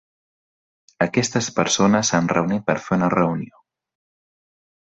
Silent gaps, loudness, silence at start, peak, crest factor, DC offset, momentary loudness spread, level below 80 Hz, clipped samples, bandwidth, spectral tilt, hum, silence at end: none; -20 LUFS; 1 s; -4 dBFS; 20 dB; under 0.1%; 7 LU; -56 dBFS; under 0.1%; 8.2 kHz; -4.5 dB/octave; none; 1.4 s